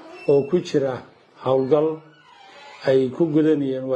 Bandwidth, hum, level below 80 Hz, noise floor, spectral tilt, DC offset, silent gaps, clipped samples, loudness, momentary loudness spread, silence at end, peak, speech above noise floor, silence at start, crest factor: 8.6 kHz; none; -66 dBFS; -48 dBFS; -7.5 dB/octave; under 0.1%; none; under 0.1%; -21 LUFS; 9 LU; 0 s; -6 dBFS; 28 dB; 0.05 s; 16 dB